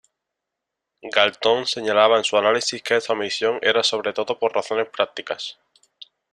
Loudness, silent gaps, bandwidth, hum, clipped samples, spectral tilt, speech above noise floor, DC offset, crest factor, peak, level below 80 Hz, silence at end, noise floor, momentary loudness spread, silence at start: -20 LUFS; none; 11.5 kHz; none; under 0.1%; -2 dB/octave; 62 dB; under 0.1%; 22 dB; 0 dBFS; -68 dBFS; 0.8 s; -83 dBFS; 10 LU; 1.05 s